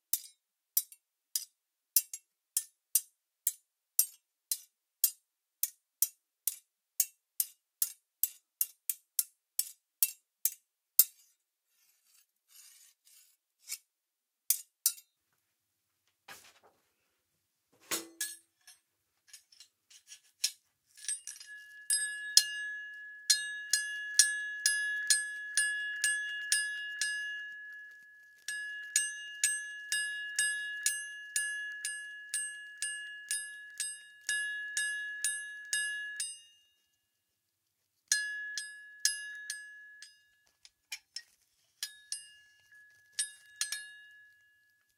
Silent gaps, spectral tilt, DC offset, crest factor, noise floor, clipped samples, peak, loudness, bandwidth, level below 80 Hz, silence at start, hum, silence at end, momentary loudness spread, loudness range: none; 5 dB/octave; under 0.1%; 34 dB; -87 dBFS; under 0.1%; -4 dBFS; -33 LUFS; 16.5 kHz; under -90 dBFS; 0.15 s; none; 0.75 s; 17 LU; 13 LU